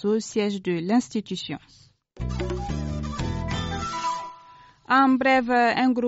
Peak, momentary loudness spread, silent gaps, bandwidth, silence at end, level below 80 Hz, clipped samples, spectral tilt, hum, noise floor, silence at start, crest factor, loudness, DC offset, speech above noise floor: -6 dBFS; 13 LU; none; 8 kHz; 0 s; -40 dBFS; under 0.1%; -4.5 dB/octave; none; -51 dBFS; 0 s; 18 dB; -24 LUFS; under 0.1%; 28 dB